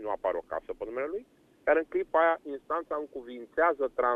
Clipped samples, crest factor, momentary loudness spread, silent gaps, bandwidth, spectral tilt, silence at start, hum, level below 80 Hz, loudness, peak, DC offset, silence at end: under 0.1%; 18 dB; 12 LU; none; 4.1 kHz; -6 dB/octave; 0 s; none; -62 dBFS; -30 LUFS; -12 dBFS; under 0.1%; 0 s